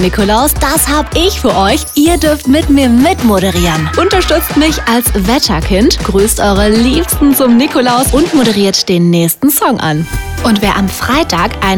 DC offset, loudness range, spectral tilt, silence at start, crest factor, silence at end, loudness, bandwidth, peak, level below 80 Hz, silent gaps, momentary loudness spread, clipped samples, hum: under 0.1%; 1 LU; -4.5 dB/octave; 0 s; 10 dB; 0 s; -10 LUFS; 19.5 kHz; 0 dBFS; -22 dBFS; none; 3 LU; under 0.1%; none